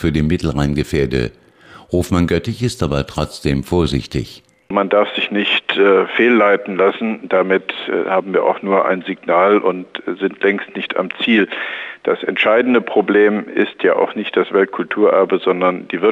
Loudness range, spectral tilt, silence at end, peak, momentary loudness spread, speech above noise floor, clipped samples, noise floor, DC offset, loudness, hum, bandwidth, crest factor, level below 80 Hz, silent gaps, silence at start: 4 LU; -6 dB/octave; 0 s; -2 dBFS; 9 LU; 27 dB; under 0.1%; -43 dBFS; under 0.1%; -16 LUFS; none; 15 kHz; 14 dB; -38 dBFS; none; 0 s